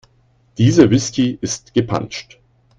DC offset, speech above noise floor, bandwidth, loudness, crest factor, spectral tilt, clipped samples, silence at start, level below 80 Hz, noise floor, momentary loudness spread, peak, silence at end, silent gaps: under 0.1%; 40 dB; 9.4 kHz; -16 LUFS; 18 dB; -6 dB/octave; under 0.1%; 0.6 s; -46 dBFS; -56 dBFS; 17 LU; 0 dBFS; 0.55 s; none